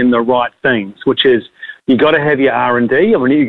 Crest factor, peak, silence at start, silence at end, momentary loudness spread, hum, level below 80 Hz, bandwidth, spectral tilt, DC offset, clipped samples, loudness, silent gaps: 10 dB; -2 dBFS; 0 s; 0 s; 5 LU; none; -50 dBFS; 4.3 kHz; -8 dB/octave; under 0.1%; under 0.1%; -12 LUFS; none